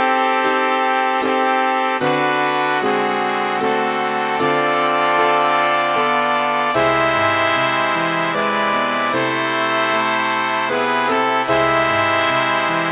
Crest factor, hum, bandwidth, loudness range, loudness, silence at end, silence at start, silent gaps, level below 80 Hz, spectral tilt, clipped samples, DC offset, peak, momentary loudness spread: 16 dB; none; 4 kHz; 2 LU; -17 LUFS; 0 s; 0 s; none; -54 dBFS; -8 dB/octave; under 0.1%; under 0.1%; -2 dBFS; 3 LU